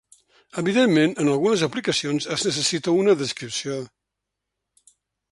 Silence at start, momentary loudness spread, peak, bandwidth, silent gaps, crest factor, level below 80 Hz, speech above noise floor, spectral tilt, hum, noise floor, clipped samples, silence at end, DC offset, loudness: 0.55 s; 11 LU; -6 dBFS; 11.5 kHz; none; 16 dB; -64 dBFS; 61 dB; -4 dB/octave; none; -82 dBFS; under 0.1%; 1.45 s; under 0.1%; -22 LUFS